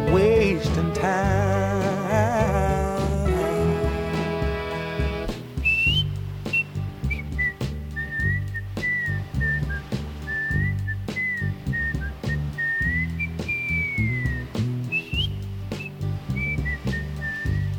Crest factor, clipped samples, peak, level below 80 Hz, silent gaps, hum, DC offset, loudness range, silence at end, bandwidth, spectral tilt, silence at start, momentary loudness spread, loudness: 16 dB; under 0.1%; -8 dBFS; -34 dBFS; none; none; under 0.1%; 4 LU; 0 s; 18.5 kHz; -6 dB/octave; 0 s; 9 LU; -25 LUFS